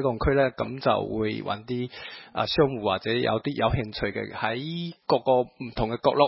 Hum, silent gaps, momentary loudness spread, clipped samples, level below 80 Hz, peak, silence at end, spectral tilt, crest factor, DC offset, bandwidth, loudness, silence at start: none; none; 9 LU; under 0.1%; -44 dBFS; -4 dBFS; 0 s; -10 dB/octave; 20 dB; under 0.1%; 5.8 kHz; -27 LUFS; 0 s